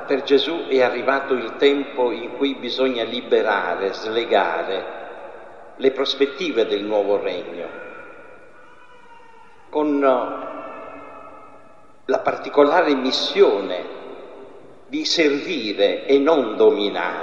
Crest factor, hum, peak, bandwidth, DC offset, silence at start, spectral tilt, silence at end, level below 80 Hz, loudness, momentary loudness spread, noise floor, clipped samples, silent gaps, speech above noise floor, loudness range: 20 dB; none; -2 dBFS; 7.6 kHz; 0.5%; 0 s; -4 dB/octave; 0 s; -70 dBFS; -20 LUFS; 20 LU; -50 dBFS; under 0.1%; none; 30 dB; 6 LU